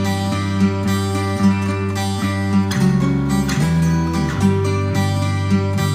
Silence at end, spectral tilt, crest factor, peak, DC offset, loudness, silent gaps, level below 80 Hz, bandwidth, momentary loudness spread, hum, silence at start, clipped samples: 0 s; -6.5 dB/octave; 14 dB; -4 dBFS; under 0.1%; -18 LUFS; none; -36 dBFS; 16 kHz; 4 LU; none; 0 s; under 0.1%